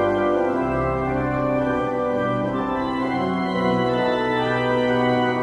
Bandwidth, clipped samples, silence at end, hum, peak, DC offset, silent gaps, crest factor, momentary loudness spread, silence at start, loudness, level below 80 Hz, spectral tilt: 10.5 kHz; under 0.1%; 0 s; none; -8 dBFS; under 0.1%; none; 12 dB; 4 LU; 0 s; -22 LUFS; -42 dBFS; -7.5 dB/octave